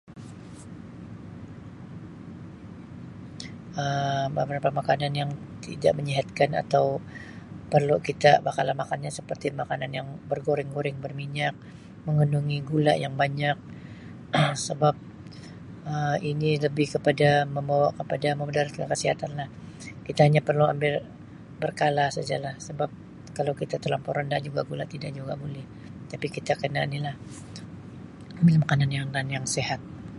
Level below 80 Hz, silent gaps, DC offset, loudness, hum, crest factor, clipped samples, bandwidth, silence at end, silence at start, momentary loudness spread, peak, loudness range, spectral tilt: -56 dBFS; none; under 0.1%; -26 LUFS; none; 22 dB; under 0.1%; 11.5 kHz; 0 s; 0.1 s; 20 LU; -4 dBFS; 7 LU; -6 dB/octave